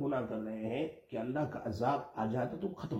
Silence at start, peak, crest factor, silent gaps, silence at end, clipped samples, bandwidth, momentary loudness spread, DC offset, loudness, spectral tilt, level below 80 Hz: 0 s; -20 dBFS; 16 dB; none; 0 s; under 0.1%; 15.5 kHz; 5 LU; under 0.1%; -37 LUFS; -8 dB/octave; -68 dBFS